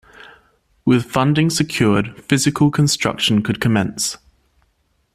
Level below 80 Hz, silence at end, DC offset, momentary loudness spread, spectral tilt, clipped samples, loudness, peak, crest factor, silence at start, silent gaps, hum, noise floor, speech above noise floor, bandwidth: -48 dBFS; 1 s; under 0.1%; 6 LU; -4.5 dB/octave; under 0.1%; -17 LUFS; -2 dBFS; 16 dB; 0.85 s; none; none; -64 dBFS; 47 dB; 15 kHz